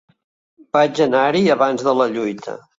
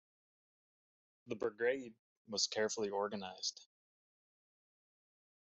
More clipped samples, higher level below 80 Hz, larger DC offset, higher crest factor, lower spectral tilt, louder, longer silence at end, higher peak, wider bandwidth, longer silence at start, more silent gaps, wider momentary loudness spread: neither; first, -62 dBFS vs -86 dBFS; neither; second, 16 dB vs 22 dB; first, -5.5 dB/octave vs -1.5 dB/octave; first, -17 LUFS vs -39 LUFS; second, 0.2 s vs 1.8 s; first, -2 dBFS vs -22 dBFS; about the same, 7.8 kHz vs 8 kHz; second, 0.75 s vs 1.25 s; second, none vs 1.99-2.25 s; about the same, 9 LU vs 11 LU